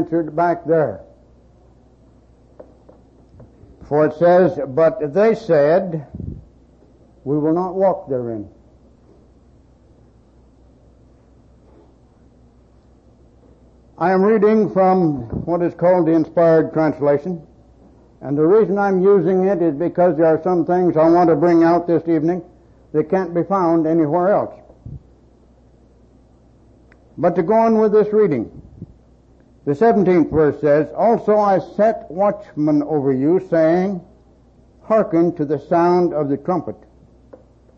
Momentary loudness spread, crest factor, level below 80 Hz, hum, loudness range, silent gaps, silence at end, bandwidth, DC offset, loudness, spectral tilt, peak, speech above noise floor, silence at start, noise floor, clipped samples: 11 LU; 14 dB; -50 dBFS; none; 8 LU; none; 1.05 s; 6.6 kHz; under 0.1%; -17 LUFS; -9.5 dB/octave; -4 dBFS; 34 dB; 0 s; -50 dBFS; under 0.1%